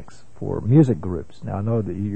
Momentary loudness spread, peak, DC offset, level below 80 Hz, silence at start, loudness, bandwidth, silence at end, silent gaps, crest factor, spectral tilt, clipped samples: 14 LU; -4 dBFS; 1%; -46 dBFS; 0 s; -21 LUFS; 8.6 kHz; 0 s; none; 18 dB; -10.5 dB/octave; under 0.1%